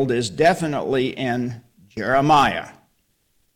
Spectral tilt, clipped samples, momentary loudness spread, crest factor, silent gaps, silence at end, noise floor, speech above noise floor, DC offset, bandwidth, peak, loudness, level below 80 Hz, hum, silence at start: -5.5 dB/octave; under 0.1%; 17 LU; 18 dB; none; 0.85 s; -66 dBFS; 46 dB; under 0.1%; 17 kHz; -4 dBFS; -20 LUFS; -50 dBFS; none; 0 s